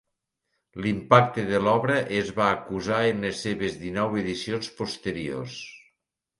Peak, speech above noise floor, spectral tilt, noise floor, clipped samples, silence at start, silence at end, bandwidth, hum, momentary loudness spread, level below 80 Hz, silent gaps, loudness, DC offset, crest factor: -2 dBFS; 55 dB; -5.5 dB/octave; -80 dBFS; under 0.1%; 0.75 s; 0.6 s; 11.5 kHz; none; 13 LU; -56 dBFS; none; -25 LUFS; under 0.1%; 24 dB